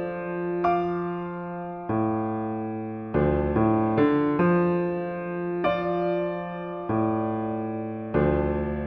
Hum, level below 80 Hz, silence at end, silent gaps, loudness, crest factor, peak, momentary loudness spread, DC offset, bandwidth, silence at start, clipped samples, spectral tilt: none; -42 dBFS; 0 s; none; -26 LUFS; 16 dB; -10 dBFS; 10 LU; under 0.1%; 5.4 kHz; 0 s; under 0.1%; -10.5 dB/octave